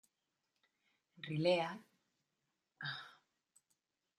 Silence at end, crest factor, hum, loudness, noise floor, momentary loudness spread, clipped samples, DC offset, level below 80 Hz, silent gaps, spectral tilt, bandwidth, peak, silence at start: 1.05 s; 24 dB; none; -39 LUFS; -88 dBFS; 19 LU; under 0.1%; under 0.1%; -88 dBFS; none; -6 dB/octave; 11 kHz; -20 dBFS; 1.2 s